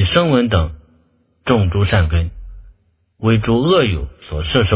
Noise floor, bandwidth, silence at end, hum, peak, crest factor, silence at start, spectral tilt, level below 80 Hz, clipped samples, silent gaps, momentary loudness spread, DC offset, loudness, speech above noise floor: -57 dBFS; 4 kHz; 0 s; none; 0 dBFS; 16 dB; 0 s; -11 dB/octave; -26 dBFS; under 0.1%; none; 12 LU; under 0.1%; -16 LUFS; 43 dB